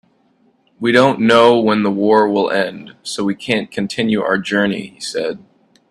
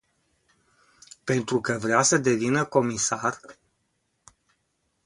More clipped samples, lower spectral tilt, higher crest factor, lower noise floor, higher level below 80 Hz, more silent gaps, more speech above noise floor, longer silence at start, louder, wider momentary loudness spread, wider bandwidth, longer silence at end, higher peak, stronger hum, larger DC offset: neither; about the same, -5 dB/octave vs -4 dB/octave; second, 16 dB vs 24 dB; second, -57 dBFS vs -74 dBFS; first, -58 dBFS vs -64 dBFS; neither; second, 42 dB vs 50 dB; second, 0.8 s vs 1.25 s; first, -16 LUFS vs -24 LUFS; first, 13 LU vs 9 LU; about the same, 12.5 kHz vs 11.5 kHz; second, 0.55 s vs 1.55 s; first, 0 dBFS vs -4 dBFS; neither; neither